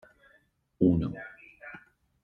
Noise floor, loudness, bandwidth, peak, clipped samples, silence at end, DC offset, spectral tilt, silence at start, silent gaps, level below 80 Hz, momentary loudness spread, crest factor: -67 dBFS; -28 LUFS; 4.3 kHz; -10 dBFS; under 0.1%; 0.45 s; under 0.1%; -11 dB/octave; 0.8 s; none; -54 dBFS; 22 LU; 22 dB